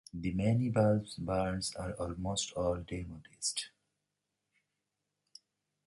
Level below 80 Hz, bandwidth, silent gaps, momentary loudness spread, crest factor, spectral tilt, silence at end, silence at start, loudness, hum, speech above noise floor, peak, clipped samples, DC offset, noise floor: -54 dBFS; 11.5 kHz; none; 12 LU; 20 dB; -5 dB/octave; 2.2 s; 0.15 s; -34 LUFS; 50 Hz at -65 dBFS; 52 dB; -16 dBFS; under 0.1%; under 0.1%; -86 dBFS